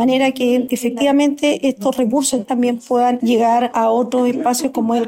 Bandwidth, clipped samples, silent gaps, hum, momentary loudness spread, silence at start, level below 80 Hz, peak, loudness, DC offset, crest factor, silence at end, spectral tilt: 16.5 kHz; under 0.1%; none; none; 4 LU; 0 s; -60 dBFS; -6 dBFS; -16 LUFS; under 0.1%; 10 dB; 0 s; -4 dB/octave